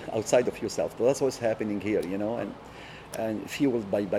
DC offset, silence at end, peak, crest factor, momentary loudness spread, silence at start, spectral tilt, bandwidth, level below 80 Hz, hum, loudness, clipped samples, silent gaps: under 0.1%; 0 s; -10 dBFS; 18 dB; 13 LU; 0 s; -5 dB/octave; 16 kHz; -58 dBFS; none; -28 LUFS; under 0.1%; none